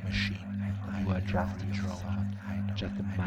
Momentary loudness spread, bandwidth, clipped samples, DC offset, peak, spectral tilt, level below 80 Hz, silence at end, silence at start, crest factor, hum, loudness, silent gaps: 4 LU; 8.4 kHz; under 0.1%; under 0.1%; -18 dBFS; -7 dB/octave; -48 dBFS; 0 s; 0 s; 16 dB; none; -34 LUFS; none